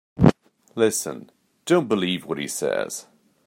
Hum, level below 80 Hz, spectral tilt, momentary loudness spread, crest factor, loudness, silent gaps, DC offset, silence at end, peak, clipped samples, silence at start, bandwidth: none; -48 dBFS; -5 dB/octave; 16 LU; 22 dB; -23 LUFS; none; under 0.1%; 0.45 s; -2 dBFS; under 0.1%; 0.15 s; 16 kHz